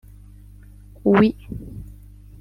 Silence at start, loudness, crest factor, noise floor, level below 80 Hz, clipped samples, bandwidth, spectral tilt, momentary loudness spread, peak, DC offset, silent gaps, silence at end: 1.05 s; -19 LUFS; 22 dB; -44 dBFS; -44 dBFS; under 0.1%; 5.4 kHz; -9 dB/octave; 23 LU; -2 dBFS; under 0.1%; none; 0.55 s